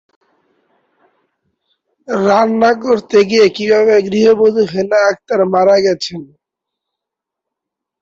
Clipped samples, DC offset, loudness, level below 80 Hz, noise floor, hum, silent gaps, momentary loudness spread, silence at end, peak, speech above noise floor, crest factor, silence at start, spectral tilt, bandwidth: under 0.1%; under 0.1%; -12 LUFS; -58 dBFS; -82 dBFS; none; none; 6 LU; 1.75 s; 0 dBFS; 70 dB; 14 dB; 2.1 s; -5 dB/octave; 7.6 kHz